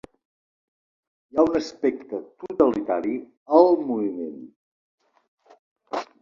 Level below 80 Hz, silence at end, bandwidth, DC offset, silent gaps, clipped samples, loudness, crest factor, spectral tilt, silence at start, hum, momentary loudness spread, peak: -62 dBFS; 0.15 s; 7.4 kHz; under 0.1%; 3.37-3.46 s, 4.56-4.98 s, 5.28-5.38 s, 5.59-5.76 s; under 0.1%; -23 LUFS; 22 dB; -6.5 dB/octave; 1.35 s; none; 17 LU; -2 dBFS